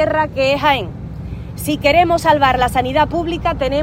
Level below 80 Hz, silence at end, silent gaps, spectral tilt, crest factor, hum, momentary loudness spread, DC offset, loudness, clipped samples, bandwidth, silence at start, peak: -32 dBFS; 0 s; none; -5 dB/octave; 16 dB; none; 16 LU; under 0.1%; -15 LUFS; under 0.1%; 16.5 kHz; 0 s; 0 dBFS